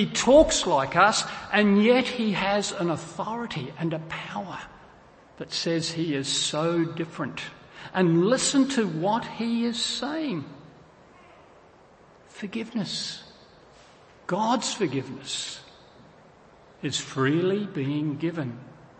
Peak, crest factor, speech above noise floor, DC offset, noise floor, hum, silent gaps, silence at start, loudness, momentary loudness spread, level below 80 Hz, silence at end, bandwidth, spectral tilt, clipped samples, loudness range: -6 dBFS; 22 dB; 29 dB; under 0.1%; -54 dBFS; none; none; 0 s; -25 LUFS; 16 LU; -54 dBFS; 0.25 s; 8.8 kHz; -4 dB/octave; under 0.1%; 10 LU